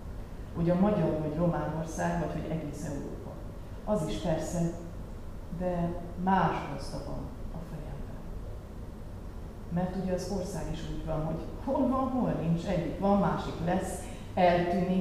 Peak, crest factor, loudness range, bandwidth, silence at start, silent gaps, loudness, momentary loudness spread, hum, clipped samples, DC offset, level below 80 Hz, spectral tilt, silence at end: -12 dBFS; 18 dB; 7 LU; 14 kHz; 0 s; none; -31 LUFS; 17 LU; none; under 0.1%; 0.2%; -42 dBFS; -7 dB/octave; 0 s